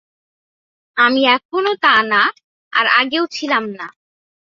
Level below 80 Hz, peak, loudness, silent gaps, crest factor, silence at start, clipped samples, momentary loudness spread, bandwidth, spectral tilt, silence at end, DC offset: -66 dBFS; -2 dBFS; -15 LUFS; 1.45-1.49 s, 2.44-2.71 s; 16 dB; 0.95 s; under 0.1%; 13 LU; 7.6 kHz; -3 dB/octave; 0.7 s; under 0.1%